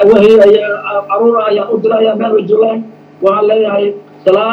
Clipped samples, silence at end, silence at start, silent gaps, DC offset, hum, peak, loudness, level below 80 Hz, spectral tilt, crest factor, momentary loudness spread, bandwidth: 2%; 0 s; 0 s; none; under 0.1%; none; 0 dBFS; -10 LUFS; -52 dBFS; -7 dB/octave; 10 dB; 10 LU; 6.4 kHz